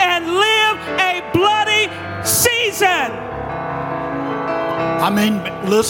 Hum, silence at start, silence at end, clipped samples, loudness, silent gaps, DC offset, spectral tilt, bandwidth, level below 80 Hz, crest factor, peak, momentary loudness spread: none; 0 s; 0 s; under 0.1%; -17 LUFS; none; under 0.1%; -3 dB/octave; 17 kHz; -46 dBFS; 16 dB; -2 dBFS; 10 LU